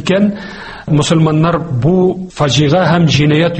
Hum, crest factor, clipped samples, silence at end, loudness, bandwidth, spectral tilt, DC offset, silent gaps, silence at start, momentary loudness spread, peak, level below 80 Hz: none; 12 dB; under 0.1%; 0 s; -12 LUFS; 8.8 kHz; -6 dB/octave; under 0.1%; none; 0 s; 6 LU; 0 dBFS; -38 dBFS